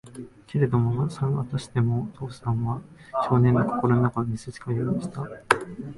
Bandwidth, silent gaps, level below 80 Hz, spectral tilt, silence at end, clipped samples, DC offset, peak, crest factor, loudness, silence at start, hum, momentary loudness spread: 11.5 kHz; none; -52 dBFS; -7.5 dB/octave; 0 s; under 0.1%; under 0.1%; 0 dBFS; 24 dB; -25 LUFS; 0.05 s; none; 13 LU